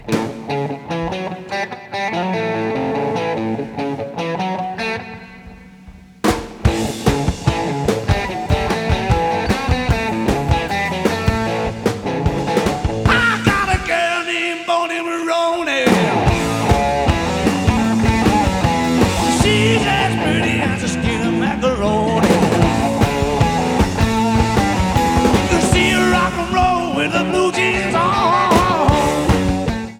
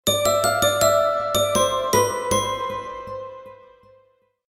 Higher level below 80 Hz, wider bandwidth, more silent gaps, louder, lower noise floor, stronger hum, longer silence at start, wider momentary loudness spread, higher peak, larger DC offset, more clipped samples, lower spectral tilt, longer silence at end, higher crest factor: first, -28 dBFS vs -50 dBFS; first, 19 kHz vs 17 kHz; neither; first, -17 LUFS vs -20 LUFS; second, -40 dBFS vs -61 dBFS; neither; about the same, 0 s vs 0.05 s; second, 8 LU vs 16 LU; first, 0 dBFS vs -4 dBFS; neither; neither; first, -5.5 dB/octave vs -2.5 dB/octave; second, 0 s vs 0.95 s; about the same, 16 dB vs 18 dB